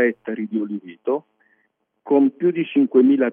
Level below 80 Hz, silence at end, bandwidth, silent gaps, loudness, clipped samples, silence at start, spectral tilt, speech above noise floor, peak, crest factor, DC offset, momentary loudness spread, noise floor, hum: -84 dBFS; 0 s; 3.6 kHz; none; -20 LUFS; under 0.1%; 0 s; -10 dB/octave; 50 dB; -4 dBFS; 16 dB; under 0.1%; 13 LU; -69 dBFS; none